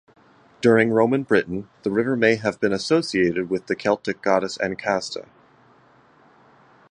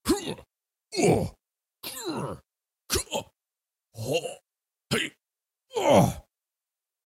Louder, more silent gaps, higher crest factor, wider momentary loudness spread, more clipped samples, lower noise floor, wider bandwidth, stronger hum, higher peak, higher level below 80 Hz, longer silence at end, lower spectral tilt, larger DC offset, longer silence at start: first, -21 LUFS vs -28 LUFS; neither; about the same, 20 dB vs 24 dB; second, 8 LU vs 19 LU; neither; second, -55 dBFS vs under -90 dBFS; second, 10.5 kHz vs 16 kHz; neither; first, -2 dBFS vs -6 dBFS; second, -58 dBFS vs -50 dBFS; first, 1.7 s vs 0.85 s; about the same, -5.5 dB/octave vs -4.5 dB/octave; neither; first, 0.6 s vs 0.05 s